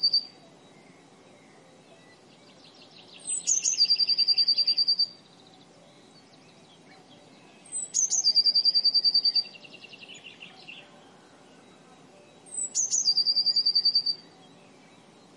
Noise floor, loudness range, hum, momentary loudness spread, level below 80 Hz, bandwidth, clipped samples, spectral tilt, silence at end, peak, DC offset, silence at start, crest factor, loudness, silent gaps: -54 dBFS; 10 LU; none; 24 LU; -86 dBFS; 11.5 kHz; under 0.1%; 2 dB/octave; 1.2 s; -12 dBFS; under 0.1%; 0 s; 18 dB; -22 LUFS; none